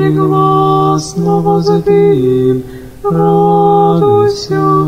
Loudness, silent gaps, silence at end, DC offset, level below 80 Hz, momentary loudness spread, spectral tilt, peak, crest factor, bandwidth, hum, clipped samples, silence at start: -10 LUFS; none; 0 s; under 0.1%; -40 dBFS; 5 LU; -7.5 dB/octave; 0 dBFS; 10 dB; 14.5 kHz; none; under 0.1%; 0 s